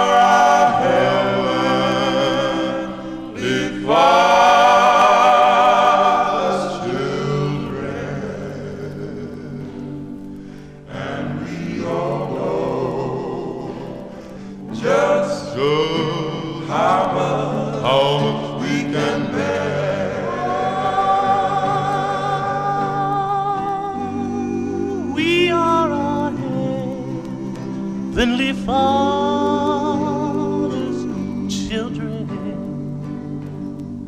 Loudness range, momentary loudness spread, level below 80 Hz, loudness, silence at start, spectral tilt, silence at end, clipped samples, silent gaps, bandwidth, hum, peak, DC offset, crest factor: 12 LU; 17 LU; -46 dBFS; -18 LUFS; 0 s; -5.5 dB/octave; 0 s; under 0.1%; none; 14.5 kHz; none; -2 dBFS; 0.2%; 16 dB